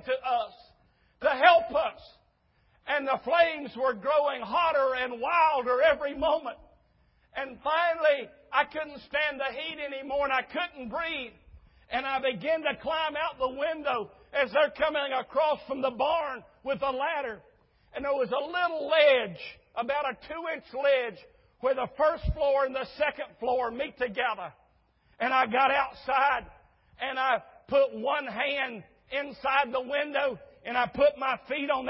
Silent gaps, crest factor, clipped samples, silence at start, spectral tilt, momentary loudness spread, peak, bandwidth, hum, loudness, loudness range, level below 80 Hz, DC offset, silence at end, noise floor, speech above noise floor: none; 24 dB; under 0.1%; 0.05 s; -8 dB/octave; 11 LU; -4 dBFS; 5.8 kHz; none; -28 LUFS; 4 LU; -52 dBFS; under 0.1%; 0 s; -68 dBFS; 40 dB